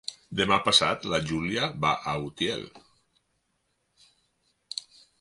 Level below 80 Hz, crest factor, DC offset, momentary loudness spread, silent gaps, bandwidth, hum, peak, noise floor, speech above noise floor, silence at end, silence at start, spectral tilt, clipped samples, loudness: -56 dBFS; 24 dB; under 0.1%; 17 LU; none; 11.5 kHz; none; -6 dBFS; -75 dBFS; 48 dB; 0.4 s; 0.1 s; -3.5 dB/octave; under 0.1%; -26 LUFS